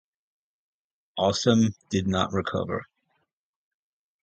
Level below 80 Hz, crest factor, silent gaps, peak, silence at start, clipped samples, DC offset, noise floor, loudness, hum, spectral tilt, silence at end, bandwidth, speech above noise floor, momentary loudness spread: -50 dBFS; 22 dB; none; -6 dBFS; 1.15 s; under 0.1%; under 0.1%; -79 dBFS; -25 LUFS; none; -5.5 dB/octave; 1.4 s; 8.8 kHz; 55 dB; 11 LU